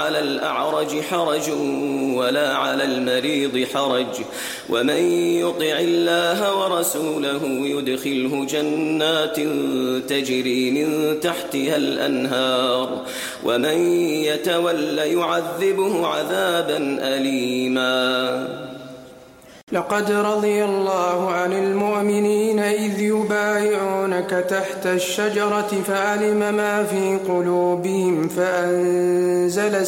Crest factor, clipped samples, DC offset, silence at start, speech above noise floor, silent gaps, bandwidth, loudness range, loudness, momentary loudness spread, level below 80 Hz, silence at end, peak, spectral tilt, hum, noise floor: 14 dB; under 0.1%; under 0.1%; 0 s; 24 dB; 19.63-19.67 s; 16.5 kHz; 2 LU; -20 LUFS; 4 LU; -64 dBFS; 0 s; -6 dBFS; -4 dB/octave; none; -45 dBFS